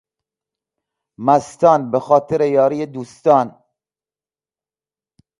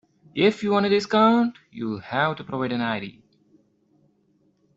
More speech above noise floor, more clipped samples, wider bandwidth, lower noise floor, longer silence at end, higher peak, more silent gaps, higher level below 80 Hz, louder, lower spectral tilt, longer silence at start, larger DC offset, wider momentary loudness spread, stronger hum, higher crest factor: first, over 74 dB vs 42 dB; neither; first, 11.5 kHz vs 7.8 kHz; first, under -90 dBFS vs -65 dBFS; first, 1.9 s vs 1.65 s; first, 0 dBFS vs -6 dBFS; neither; about the same, -62 dBFS vs -66 dBFS; first, -16 LUFS vs -23 LUFS; about the same, -7 dB/octave vs -6 dB/octave; first, 1.2 s vs 0.35 s; neither; second, 10 LU vs 13 LU; neither; about the same, 18 dB vs 18 dB